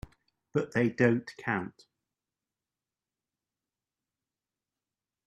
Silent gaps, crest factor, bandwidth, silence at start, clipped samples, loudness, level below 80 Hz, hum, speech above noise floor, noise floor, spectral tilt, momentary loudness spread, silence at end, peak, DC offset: none; 24 dB; 8.8 kHz; 0.55 s; under 0.1%; -30 LUFS; -64 dBFS; none; over 61 dB; under -90 dBFS; -7.5 dB/octave; 9 LU; 3.55 s; -10 dBFS; under 0.1%